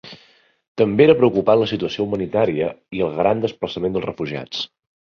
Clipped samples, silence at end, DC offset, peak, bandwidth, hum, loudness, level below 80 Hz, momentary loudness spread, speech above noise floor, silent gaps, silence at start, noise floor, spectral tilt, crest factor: under 0.1%; 0.5 s; under 0.1%; -2 dBFS; 6.8 kHz; none; -19 LUFS; -52 dBFS; 13 LU; 36 dB; 0.68-0.75 s; 0.05 s; -55 dBFS; -7 dB/octave; 18 dB